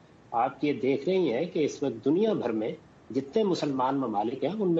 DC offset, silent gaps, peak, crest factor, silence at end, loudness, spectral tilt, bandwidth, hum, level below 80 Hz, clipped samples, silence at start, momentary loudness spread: under 0.1%; none; -14 dBFS; 14 dB; 0 s; -28 LUFS; -6.5 dB/octave; 8 kHz; none; -70 dBFS; under 0.1%; 0.3 s; 7 LU